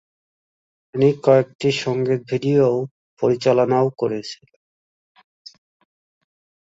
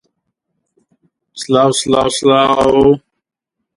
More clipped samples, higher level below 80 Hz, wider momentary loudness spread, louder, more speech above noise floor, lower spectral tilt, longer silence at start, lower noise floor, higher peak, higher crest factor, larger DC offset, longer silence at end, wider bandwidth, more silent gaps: neither; second, -62 dBFS vs -44 dBFS; first, 13 LU vs 6 LU; second, -19 LUFS vs -12 LUFS; first, over 72 dB vs 66 dB; first, -7 dB/octave vs -4.5 dB/octave; second, 0.95 s vs 1.35 s; first, under -90 dBFS vs -77 dBFS; about the same, -2 dBFS vs 0 dBFS; first, 20 dB vs 14 dB; neither; first, 2.4 s vs 0.8 s; second, 8 kHz vs 11.5 kHz; first, 1.55-1.59 s, 2.91-3.17 s vs none